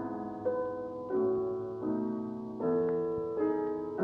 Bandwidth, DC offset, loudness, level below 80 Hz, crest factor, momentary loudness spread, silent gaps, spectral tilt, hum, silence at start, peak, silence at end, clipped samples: 5 kHz; under 0.1%; -34 LUFS; -66 dBFS; 12 dB; 7 LU; none; -10.5 dB/octave; none; 0 s; -20 dBFS; 0 s; under 0.1%